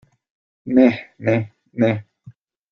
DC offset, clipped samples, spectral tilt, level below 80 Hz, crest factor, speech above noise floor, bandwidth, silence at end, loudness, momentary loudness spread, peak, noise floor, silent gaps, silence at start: under 0.1%; under 0.1%; -9 dB/octave; -60 dBFS; 20 dB; 30 dB; 6.4 kHz; 0.4 s; -19 LUFS; 15 LU; -2 dBFS; -47 dBFS; none; 0.65 s